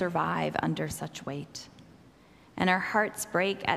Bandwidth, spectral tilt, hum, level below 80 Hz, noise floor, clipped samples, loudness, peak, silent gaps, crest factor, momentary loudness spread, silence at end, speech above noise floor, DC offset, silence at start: 15.5 kHz; -4.5 dB/octave; none; -60 dBFS; -57 dBFS; under 0.1%; -30 LUFS; -8 dBFS; none; 22 dB; 17 LU; 0 s; 27 dB; under 0.1%; 0 s